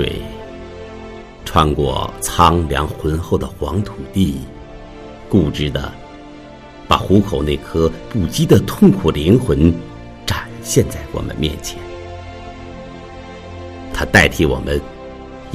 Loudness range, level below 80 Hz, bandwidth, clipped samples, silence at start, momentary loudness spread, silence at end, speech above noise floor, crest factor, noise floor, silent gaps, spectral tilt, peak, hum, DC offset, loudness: 8 LU; -32 dBFS; 15.5 kHz; under 0.1%; 0 s; 21 LU; 0 s; 21 dB; 18 dB; -36 dBFS; none; -5.5 dB/octave; 0 dBFS; none; under 0.1%; -17 LUFS